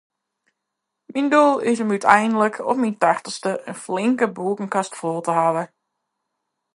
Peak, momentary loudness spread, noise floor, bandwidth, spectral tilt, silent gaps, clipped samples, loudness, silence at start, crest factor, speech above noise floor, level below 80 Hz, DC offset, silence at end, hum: 0 dBFS; 11 LU; -80 dBFS; 11.5 kHz; -5 dB/octave; none; under 0.1%; -20 LUFS; 1.1 s; 22 dB; 61 dB; -72 dBFS; under 0.1%; 1.1 s; none